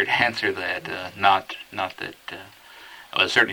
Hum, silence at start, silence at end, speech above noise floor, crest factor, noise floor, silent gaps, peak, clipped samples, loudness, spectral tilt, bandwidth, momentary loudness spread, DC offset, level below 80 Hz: none; 0 s; 0 s; 21 dB; 22 dB; -45 dBFS; none; -2 dBFS; under 0.1%; -23 LUFS; -3 dB/octave; over 20 kHz; 22 LU; under 0.1%; -66 dBFS